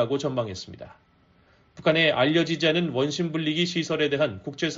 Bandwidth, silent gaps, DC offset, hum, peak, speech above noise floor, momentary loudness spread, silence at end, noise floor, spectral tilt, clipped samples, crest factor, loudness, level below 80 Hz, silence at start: 7.8 kHz; none; under 0.1%; none; -8 dBFS; 35 dB; 11 LU; 0 s; -60 dBFS; -3.5 dB/octave; under 0.1%; 18 dB; -24 LUFS; -62 dBFS; 0 s